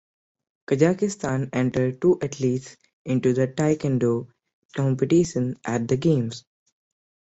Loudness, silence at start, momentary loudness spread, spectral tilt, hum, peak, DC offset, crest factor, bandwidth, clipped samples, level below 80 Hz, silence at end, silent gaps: -23 LUFS; 0.7 s; 8 LU; -7 dB/octave; none; -4 dBFS; under 0.1%; 20 dB; 8.2 kHz; under 0.1%; -58 dBFS; 0.9 s; 2.93-3.05 s, 4.53-4.69 s